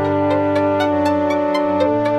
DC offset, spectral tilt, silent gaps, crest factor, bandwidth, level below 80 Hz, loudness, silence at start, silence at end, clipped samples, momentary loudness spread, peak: under 0.1%; -7 dB/octave; none; 12 dB; 12 kHz; -54 dBFS; -17 LUFS; 0 s; 0 s; under 0.1%; 1 LU; -4 dBFS